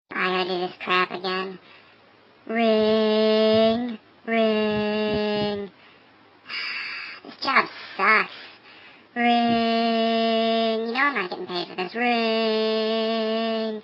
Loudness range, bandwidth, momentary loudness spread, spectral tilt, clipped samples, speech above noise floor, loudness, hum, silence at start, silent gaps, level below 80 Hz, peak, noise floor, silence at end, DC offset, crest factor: 4 LU; 7.6 kHz; 12 LU; -6.5 dB/octave; under 0.1%; 32 dB; -23 LUFS; none; 0.1 s; none; -62 dBFS; -4 dBFS; -54 dBFS; 0 s; under 0.1%; 20 dB